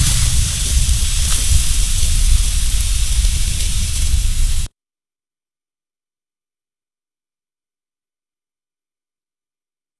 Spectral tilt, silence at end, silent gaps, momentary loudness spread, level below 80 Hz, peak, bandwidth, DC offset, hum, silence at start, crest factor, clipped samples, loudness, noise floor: -2 dB/octave; 5.3 s; none; 4 LU; -18 dBFS; 0 dBFS; 12 kHz; under 0.1%; none; 0 s; 18 dB; under 0.1%; -17 LUFS; under -90 dBFS